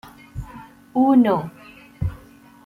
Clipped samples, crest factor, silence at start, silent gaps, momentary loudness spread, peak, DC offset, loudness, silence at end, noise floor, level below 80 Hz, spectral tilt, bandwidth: under 0.1%; 16 dB; 0.35 s; none; 22 LU; -6 dBFS; under 0.1%; -20 LUFS; 0.5 s; -47 dBFS; -42 dBFS; -9 dB/octave; 12.5 kHz